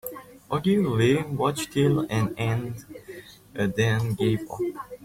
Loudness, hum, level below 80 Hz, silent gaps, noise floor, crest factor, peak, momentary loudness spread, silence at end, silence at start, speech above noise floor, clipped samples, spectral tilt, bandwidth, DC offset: -25 LUFS; none; -54 dBFS; none; -44 dBFS; 16 dB; -8 dBFS; 18 LU; 0 s; 0.05 s; 20 dB; under 0.1%; -6.5 dB/octave; 16.5 kHz; under 0.1%